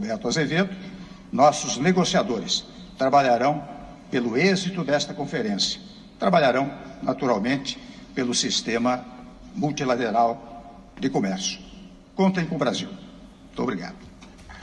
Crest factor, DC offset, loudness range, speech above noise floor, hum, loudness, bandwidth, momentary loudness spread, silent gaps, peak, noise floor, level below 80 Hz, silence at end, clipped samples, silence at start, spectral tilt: 20 dB; under 0.1%; 5 LU; 22 dB; none; -24 LUFS; 10 kHz; 20 LU; none; -4 dBFS; -45 dBFS; -54 dBFS; 0 s; under 0.1%; 0 s; -4.5 dB/octave